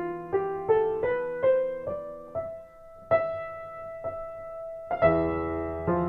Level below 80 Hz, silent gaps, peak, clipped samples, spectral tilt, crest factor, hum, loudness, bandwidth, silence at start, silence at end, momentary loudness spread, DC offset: -52 dBFS; none; -10 dBFS; under 0.1%; -9.5 dB/octave; 20 dB; none; -29 LUFS; 5 kHz; 0 s; 0 s; 14 LU; under 0.1%